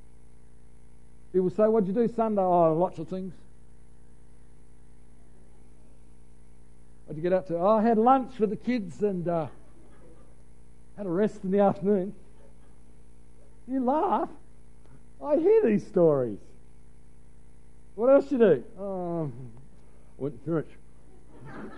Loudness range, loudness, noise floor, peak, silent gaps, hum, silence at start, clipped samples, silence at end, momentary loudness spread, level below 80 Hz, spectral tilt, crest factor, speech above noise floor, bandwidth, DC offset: 6 LU; -26 LUFS; -55 dBFS; -8 dBFS; none; 60 Hz at -55 dBFS; 1.35 s; under 0.1%; 0 s; 16 LU; -56 dBFS; -9 dB/octave; 20 dB; 30 dB; 11 kHz; 0.8%